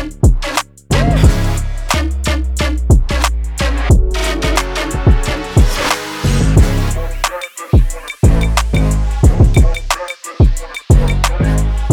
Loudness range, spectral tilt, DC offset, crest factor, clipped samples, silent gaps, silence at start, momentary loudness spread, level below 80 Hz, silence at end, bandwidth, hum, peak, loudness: 1 LU; -5.5 dB/octave; under 0.1%; 12 dB; under 0.1%; none; 0 s; 8 LU; -14 dBFS; 0 s; 17 kHz; none; 0 dBFS; -15 LUFS